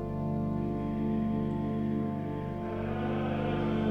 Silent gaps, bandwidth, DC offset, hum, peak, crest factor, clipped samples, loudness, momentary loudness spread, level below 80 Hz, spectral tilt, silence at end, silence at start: none; 5.6 kHz; 0.1%; none; -18 dBFS; 12 dB; under 0.1%; -32 LUFS; 4 LU; -48 dBFS; -9.5 dB/octave; 0 s; 0 s